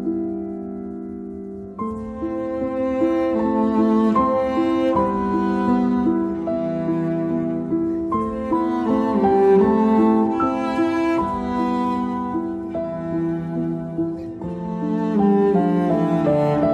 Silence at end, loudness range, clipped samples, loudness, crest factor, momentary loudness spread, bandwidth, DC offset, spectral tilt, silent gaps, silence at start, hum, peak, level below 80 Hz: 0 s; 6 LU; under 0.1%; -21 LUFS; 14 dB; 12 LU; 8.4 kHz; under 0.1%; -9 dB/octave; none; 0 s; none; -6 dBFS; -46 dBFS